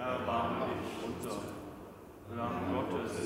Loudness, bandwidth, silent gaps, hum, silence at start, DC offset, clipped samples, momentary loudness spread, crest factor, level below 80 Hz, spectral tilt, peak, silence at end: -37 LUFS; 16 kHz; none; none; 0 s; under 0.1%; under 0.1%; 15 LU; 16 dB; -60 dBFS; -6 dB/octave; -22 dBFS; 0 s